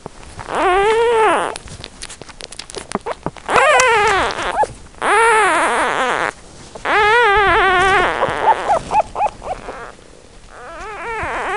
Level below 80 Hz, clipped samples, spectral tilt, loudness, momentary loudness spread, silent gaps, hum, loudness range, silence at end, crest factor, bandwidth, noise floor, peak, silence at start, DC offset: -40 dBFS; under 0.1%; -2.5 dB/octave; -15 LUFS; 20 LU; none; none; 5 LU; 0 s; 16 dB; 11.5 kHz; -42 dBFS; 0 dBFS; 0.15 s; 0.4%